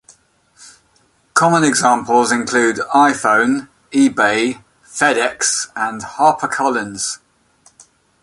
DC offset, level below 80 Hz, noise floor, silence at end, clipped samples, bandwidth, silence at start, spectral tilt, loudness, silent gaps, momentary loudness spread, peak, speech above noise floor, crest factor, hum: under 0.1%; -58 dBFS; -57 dBFS; 1.05 s; under 0.1%; 11.5 kHz; 0.6 s; -3 dB/octave; -15 LUFS; none; 10 LU; 0 dBFS; 42 dB; 16 dB; none